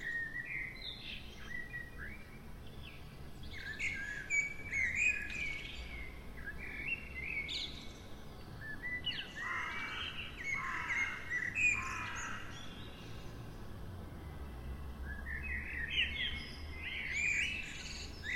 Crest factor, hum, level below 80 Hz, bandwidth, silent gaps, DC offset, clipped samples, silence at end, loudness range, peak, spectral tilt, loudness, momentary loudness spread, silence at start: 18 dB; none; -52 dBFS; 16 kHz; none; under 0.1%; under 0.1%; 0 s; 9 LU; -22 dBFS; -2.5 dB/octave; -38 LUFS; 17 LU; 0 s